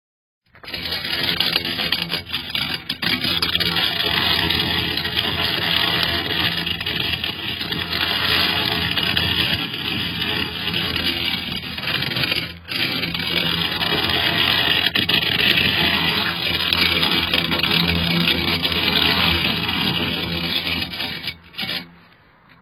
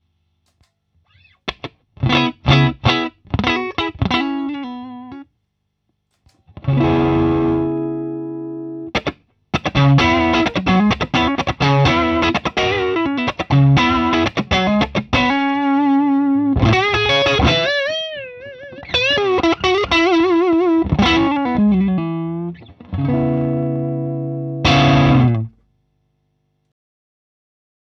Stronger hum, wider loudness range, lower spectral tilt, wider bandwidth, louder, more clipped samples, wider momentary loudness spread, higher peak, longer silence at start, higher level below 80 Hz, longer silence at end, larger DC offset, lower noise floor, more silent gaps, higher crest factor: second, none vs 50 Hz at -50 dBFS; about the same, 4 LU vs 5 LU; second, -4 dB/octave vs -6.5 dB/octave; first, 16.5 kHz vs 7.2 kHz; second, -19 LUFS vs -16 LUFS; neither; second, 8 LU vs 14 LU; about the same, 0 dBFS vs 0 dBFS; second, 0.55 s vs 1.45 s; second, -42 dBFS vs -36 dBFS; second, 0.7 s vs 2.5 s; neither; second, -51 dBFS vs -71 dBFS; neither; about the same, 22 dB vs 18 dB